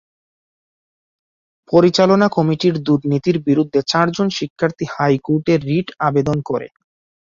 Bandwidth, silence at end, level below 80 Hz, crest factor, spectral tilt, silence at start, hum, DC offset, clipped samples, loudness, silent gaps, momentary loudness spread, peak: 7.6 kHz; 0.6 s; -54 dBFS; 16 dB; -6.5 dB/octave; 1.7 s; none; under 0.1%; under 0.1%; -17 LUFS; 4.50-4.56 s; 8 LU; -2 dBFS